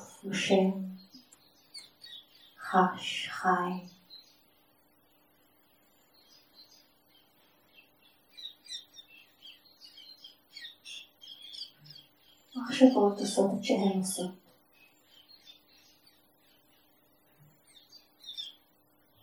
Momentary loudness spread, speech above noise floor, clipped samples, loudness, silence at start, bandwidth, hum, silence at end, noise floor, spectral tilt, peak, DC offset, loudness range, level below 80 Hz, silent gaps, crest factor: 25 LU; 40 dB; under 0.1%; -30 LUFS; 0 s; 20 kHz; none; 0.7 s; -67 dBFS; -4.5 dB/octave; -8 dBFS; under 0.1%; 20 LU; -86 dBFS; none; 28 dB